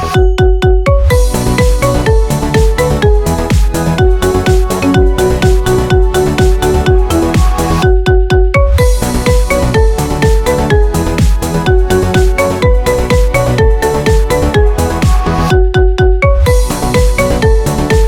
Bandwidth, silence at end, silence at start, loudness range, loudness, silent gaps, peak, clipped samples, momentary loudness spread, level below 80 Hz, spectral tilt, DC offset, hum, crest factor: 16.5 kHz; 0 s; 0 s; 1 LU; -11 LUFS; none; 0 dBFS; under 0.1%; 2 LU; -12 dBFS; -6 dB/octave; under 0.1%; none; 8 dB